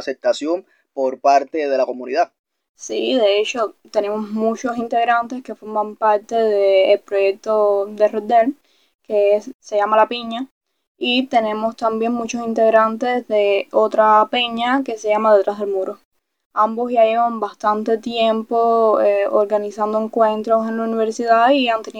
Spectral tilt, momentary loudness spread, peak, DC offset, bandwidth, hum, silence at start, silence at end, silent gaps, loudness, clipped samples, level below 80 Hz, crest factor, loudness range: -4 dB/octave; 9 LU; -2 dBFS; under 0.1%; 9.4 kHz; none; 0 s; 0 s; 2.39-2.44 s, 2.69-2.75 s, 8.94-8.99 s, 9.54-9.60 s, 10.51-10.61 s, 10.87-10.95 s, 16.05-16.12 s, 16.45-16.51 s; -18 LUFS; under 0.1%; -68 dBFS; 16 dB; 3 LU